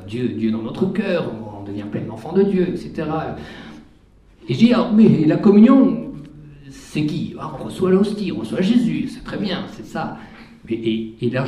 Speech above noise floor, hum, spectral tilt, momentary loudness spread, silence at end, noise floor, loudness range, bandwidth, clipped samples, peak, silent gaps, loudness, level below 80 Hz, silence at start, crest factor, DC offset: 32 dB; none; -8 dB/octave; 17 LU; 0 s; -50 dBFS; 7 LU; 11 kHz; under 0.1%; 0 dBFS; none; -19 LUFS; -50 dBFS; 0 s; 18 dB; under 0.1%